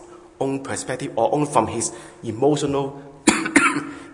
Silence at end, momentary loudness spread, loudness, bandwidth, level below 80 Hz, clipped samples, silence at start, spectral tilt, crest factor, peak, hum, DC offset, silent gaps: 0 s; 11 LU; -21 LUFS; 11 kHz; -56 dBFS; under 0.1%; 0 s; -4 dB/octave; 20 dB; -2 dBFS; none; under 0.1%; none